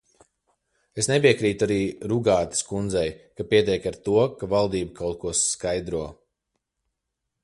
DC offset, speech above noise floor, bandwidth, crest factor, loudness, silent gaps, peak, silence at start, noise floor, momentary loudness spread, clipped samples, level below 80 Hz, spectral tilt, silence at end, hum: under 0.1%; 58 dB; 11.5 kHz; 20 dB; -24 LUFS; none; -4 dBFS; 0.95 s; -82 dBFS; 11 LU; under 0.1%; -50 dBFS; -4 dB/octave; 1.3 s; none